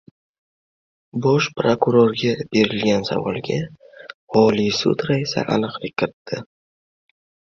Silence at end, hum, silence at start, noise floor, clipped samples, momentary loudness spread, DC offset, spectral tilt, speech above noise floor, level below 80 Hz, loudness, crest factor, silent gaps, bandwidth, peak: 1.1 s; none; 1.15 s; under -90 dBFS; under 0.1%; 15 LU; under 0.1%; -6 dB/octave; over 71 dB; -56 dBFS; -20 LUFS; 18 dB; 4.14-4.27 s, 6.13-6.25 s; 7.6 kHz; -2 dBFS